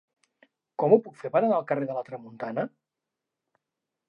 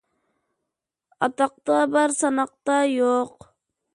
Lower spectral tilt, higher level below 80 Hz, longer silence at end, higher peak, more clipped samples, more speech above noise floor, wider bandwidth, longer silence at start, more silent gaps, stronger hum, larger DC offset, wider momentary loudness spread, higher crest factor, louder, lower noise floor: first, -9.5 dB/octave vs -3 dB/octave; second, -88 dBFS vs -72 dBFS; first, 1.4 s vs 0.65 s; about the same, -6 dBFS vs -4 dBFS; neither; about the same, 61 dB vs 62 dB; second, 5.6 kHz vs 11 kHz; second, 0.8 s vs 1.2 s; neither; neither; neither; first, 15 LU vs 6 LU; about the same, 22 dB vs 20 dB; second, -27 LUFS vs -22 LUFS; about the same, -87 dBFS vs -84 dBFS